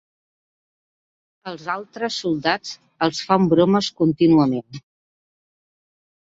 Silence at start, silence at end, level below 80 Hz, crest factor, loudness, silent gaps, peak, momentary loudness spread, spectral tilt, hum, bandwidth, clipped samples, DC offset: 1.45 s; 1.6 s; -60 dBFS; 20 dB; -20 LUFS; none; -2 dBFS; 19 LU; -6 dB/octave; none; 7.8 kHz; under 0.1%; under 0.1%